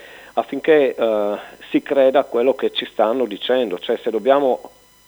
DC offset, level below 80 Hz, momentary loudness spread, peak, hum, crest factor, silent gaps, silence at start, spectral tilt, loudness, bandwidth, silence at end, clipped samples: under 0.1%; -64 dBFS; 9 LU; -2 dBFS; none; 18 dB; none; 0 s; -5.5 dB/octave; -19 LUFS; over 20 kHz; 0.4 s; under 0.1%